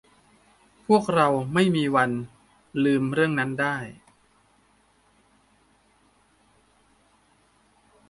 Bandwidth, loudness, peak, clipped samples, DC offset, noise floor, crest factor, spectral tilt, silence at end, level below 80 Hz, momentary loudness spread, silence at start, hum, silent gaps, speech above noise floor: 11.5 kHz; -23 LUFS; -6 dBFS; under 0.1%; under 0.1%; -62 dBFS; 22 dB; -6.5 dB/octave; 4.15 s; -62 dBFS; 13 LU; 0.9 s; none; none; 40 dB